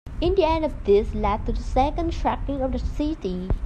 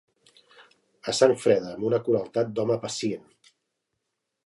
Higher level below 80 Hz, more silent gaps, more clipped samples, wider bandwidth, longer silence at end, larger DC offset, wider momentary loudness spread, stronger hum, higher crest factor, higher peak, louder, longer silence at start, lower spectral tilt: first, -30 dBFS vs -70 dBFS; neither; neither; second, 8.8 kHz vs 11.5 kHz; second, 0 s vs 1.25 s; neither; second, 7 LU vs 10 LU; neither; second, 16 dB vs 22 dB; about the same, -8 dBFS vs -6 dBFS; about the same, -24 LUFS vs -25 LUFS; second, 0.05 s vs 1.05 s; first, -7.5 dB/octave vs -5 dB/octave